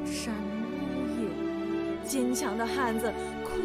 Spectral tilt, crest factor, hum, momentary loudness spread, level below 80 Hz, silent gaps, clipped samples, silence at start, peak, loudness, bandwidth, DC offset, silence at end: -4.5 dB/octave; 14 dB; none; 5 LU; -52 dBFS; none; under 0.1%; 0 s; -16 dBFS; -31 LUFS; 15.5 kHz; under 0.1%; 0 s